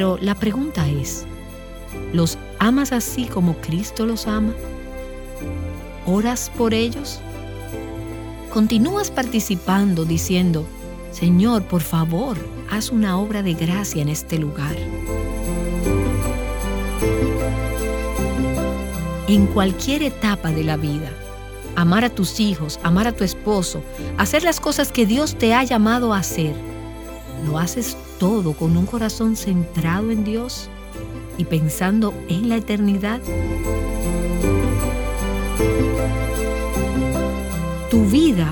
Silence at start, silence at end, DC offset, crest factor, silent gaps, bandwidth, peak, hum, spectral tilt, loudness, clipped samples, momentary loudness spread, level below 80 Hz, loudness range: 0 s; 0 s; under 0.1%; 20 dB; none; over 20 kHz; 0 dBFS; none; -5.5 dB/octave; -20 LUFS; under 0.1%; 14 LU; -30 dBFS; 4 LU